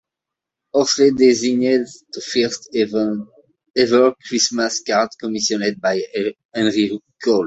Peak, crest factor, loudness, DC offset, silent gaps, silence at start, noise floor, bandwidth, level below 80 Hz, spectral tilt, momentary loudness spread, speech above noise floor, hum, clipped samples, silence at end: -2 dBFS; 18 dB; -18 LUFS; under 0.1%; 6.45-6.49 s; 0.75 s; -85 dBFS; 8.2 kHz; -60 dBFS; -3.5 dB/octave; 9 LU; 67 dB; none; under 0.1%; 0 s